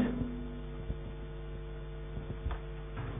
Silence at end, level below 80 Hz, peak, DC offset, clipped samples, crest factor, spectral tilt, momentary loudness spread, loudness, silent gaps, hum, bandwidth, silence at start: 0 s; -42 dBFS; -20 dBFS; under 0.1%; under 0.1%; 18 dB; -7 dB/octave; 6 LU; -42 LUFS; none; none; 3.7 kHz; 0 s